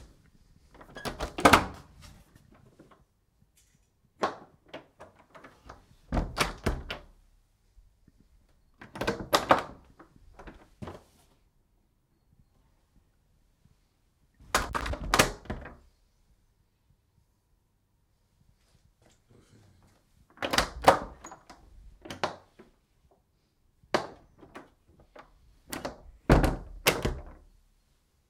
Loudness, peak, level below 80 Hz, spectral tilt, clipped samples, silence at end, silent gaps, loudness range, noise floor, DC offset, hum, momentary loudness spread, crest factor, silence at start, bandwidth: -29 LUFS; -4 dBFS; -44 dBFS; -4 dB/octave; under 0.1%; 1 s; none; 13 LU; -71 dBFS; under 0.1%; none; 27 LU; 30 dB; 0 s; 16 kHz